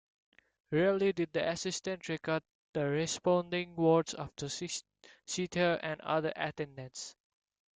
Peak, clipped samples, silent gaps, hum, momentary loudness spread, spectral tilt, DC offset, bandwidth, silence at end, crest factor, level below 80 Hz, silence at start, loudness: -16 dBFS; under 0.1%; 2.55-2.73 s; none; 13 LU; -4.5 dB/octave; under 0.1%; 9.6 kHz; 0.65 s; 18 dB; -70 dBFS; 0.7 s; -34 LUFS